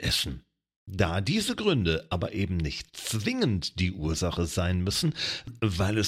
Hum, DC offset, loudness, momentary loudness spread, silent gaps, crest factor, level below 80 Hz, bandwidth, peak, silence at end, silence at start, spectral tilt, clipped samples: none; under 0.1%; -28 LUFS; 6 LU; 0.76-0.86 s; 18 dB; -44 dBFS; 16 kHz; -10 dBFS; 0 s; 0 s; -4.5 dB/octave; under 0.1%